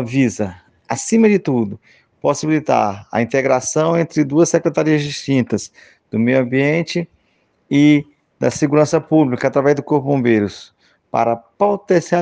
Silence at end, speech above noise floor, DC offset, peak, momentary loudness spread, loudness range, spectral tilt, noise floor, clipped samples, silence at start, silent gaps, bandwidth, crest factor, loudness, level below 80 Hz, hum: 0 s; 46 dB; under 0.1%; 0 dBFS; 10 LU; 2 LU; -6 dB/octave; -61 dBFS; under 0.1%; 0 s; none; 9.8 kHz; 16 dB; -17 LUFS; -60 dBFS; none